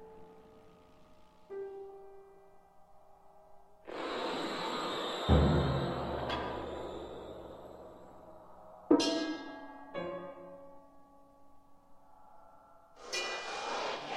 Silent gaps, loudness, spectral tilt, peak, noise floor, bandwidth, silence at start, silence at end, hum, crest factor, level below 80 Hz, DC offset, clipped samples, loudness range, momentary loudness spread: none; -35 LUFS; -5.5 dB/octave; -14 dBFS; -59 dBFS; 12.5 kHz; 0 s; 0 s; none; 24 dB; -48 dBFS; under 0.1%; under 0.1%; 17 LU; 26 LU